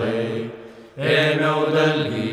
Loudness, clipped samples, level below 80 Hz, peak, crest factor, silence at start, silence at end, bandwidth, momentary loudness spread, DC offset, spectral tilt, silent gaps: -20 LUFS; under 0.1%; -66 dBFS; -6 dBFS; 16 dB; 0 s; 0 s; 13 kHz; 17 LU; under 0.1%; -6 dB/octave; none